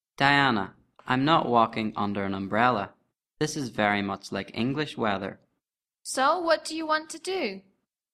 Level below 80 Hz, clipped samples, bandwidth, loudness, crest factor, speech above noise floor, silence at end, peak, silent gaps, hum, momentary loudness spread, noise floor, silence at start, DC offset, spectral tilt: -64 dBFS; under 0.1%; 14.5 kHz; -26 LUFS; 24 dB; 60 dB; 0.55 s; -4 dBFS; none; none; 12 LU; -86 dBFS; 0.2 s; under 0.1%; -4.5 dB/octave